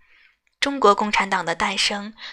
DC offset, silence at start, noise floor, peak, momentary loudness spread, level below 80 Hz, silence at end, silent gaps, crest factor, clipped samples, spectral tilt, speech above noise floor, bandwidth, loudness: under 0.1%; 0.6 s; -58 dBFS; -2 dBFS; 8 LU; -54 dBFS; 0 s; none; 22 dB; under 0.1%; -2.5 dB/octave; 37 dB; 13 kHz; -20 LUFS